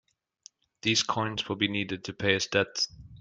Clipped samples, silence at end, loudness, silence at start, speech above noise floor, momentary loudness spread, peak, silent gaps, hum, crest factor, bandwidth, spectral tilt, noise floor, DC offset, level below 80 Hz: under 0.1%; 0 s; -28 LUFS; 0.85 s; 29 dB; 6 LU; -10 dBFS; none; none; 20 dB; 10 kHz; -3 dB/octave; -58 dBFS; under 0.1%; -62 dBFS